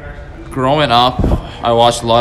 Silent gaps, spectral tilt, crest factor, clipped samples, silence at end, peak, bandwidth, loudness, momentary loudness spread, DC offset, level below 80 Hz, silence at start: none; -5 dB/octave; 14 dB; under 0.1%; 0 s; 0 dBFS; 14 kHz; -13 LUFS; 16 LU; under 0.1%; -24 dBFS; 0 s